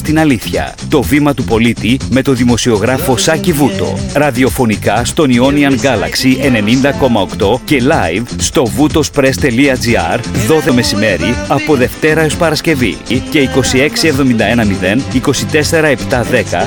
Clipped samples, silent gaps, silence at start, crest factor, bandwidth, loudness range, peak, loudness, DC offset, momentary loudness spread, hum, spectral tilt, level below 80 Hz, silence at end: under 0.1%; none; 0 s; 10 dB; 19.5 kHz; 1 LU; 0 dBFS; -11 LUFS; under 0.1%; 4 LU; none; -5 dB/octave; -30 dBFS; 0 s